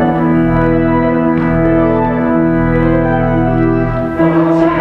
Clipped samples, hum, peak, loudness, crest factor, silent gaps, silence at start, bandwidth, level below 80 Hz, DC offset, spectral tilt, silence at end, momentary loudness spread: under 0.1%; none; 0 dBFS; -12 LUFS; 10 dB; none; 0 s; 4.5 kHz; -26 dBFS; under 0.1%; -10 dB/octave; 0 s; 2 LU